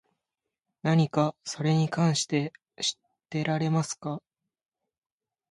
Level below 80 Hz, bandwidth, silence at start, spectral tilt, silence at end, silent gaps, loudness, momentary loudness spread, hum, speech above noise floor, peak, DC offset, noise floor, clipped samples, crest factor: -70 dBFS; 11.5 kHz; 0.85 s; -5 dB/octave; 1.3 s; none; -28 LUFS; 12 LU; none; 61 dB; -10 dBFS; under 0.1%; -87 dBFS; under 0.1%; 20 dB